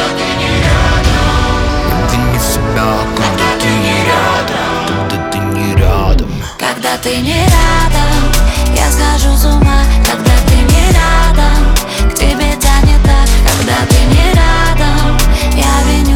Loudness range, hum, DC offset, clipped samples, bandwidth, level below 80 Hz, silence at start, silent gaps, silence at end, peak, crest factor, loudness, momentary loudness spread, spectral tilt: 3 LU; none; under 0.1%; under 0.1%; 17 kHz; -12 dBFS; 0 s; none; 0 s; 0 dBFS; 8 dB; -11 LUFS; 5 LU; -4.5 dB/octave